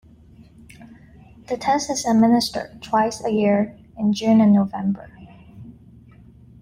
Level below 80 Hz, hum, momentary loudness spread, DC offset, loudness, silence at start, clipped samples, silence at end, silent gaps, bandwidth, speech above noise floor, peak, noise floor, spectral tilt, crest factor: -54 dBFS; none; 11 LU; under 0.1%; -20 LUFS; 0.8 s; under 0.1%; 0.9 s; none; 15.5 kHz; 29 dB; -6 dBFS; -48 dBFS; -5.5 dB/octave; 16 dB